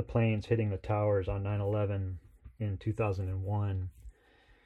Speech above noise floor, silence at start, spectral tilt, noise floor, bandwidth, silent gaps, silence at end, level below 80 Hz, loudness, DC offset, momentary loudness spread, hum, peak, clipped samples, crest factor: 32 dB; 0 s; -9.5 dB/octave; -64 dBFS; 5.2 kHz; none; 0.55 s; -52 dBFS; -33 LUFS; under 0.1%; 9 LU; none; -16 dBFS; under 0.1%; 16 dB